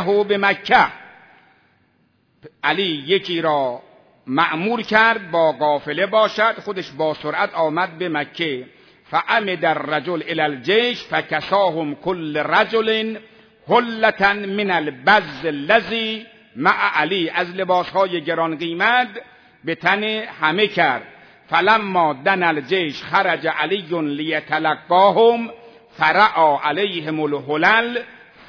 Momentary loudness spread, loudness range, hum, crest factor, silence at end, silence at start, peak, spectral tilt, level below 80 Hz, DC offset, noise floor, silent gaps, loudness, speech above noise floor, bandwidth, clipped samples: 9 LU; 4 LU; none; 18 dB; 0.35 s; 0 s; 0 dBFS; -5.5 dB/octave; -62 dBFS; under 0.1%; -61 dBFS; none; -18 LUFS; 43 dB; 5.4 kHz; under 0.1%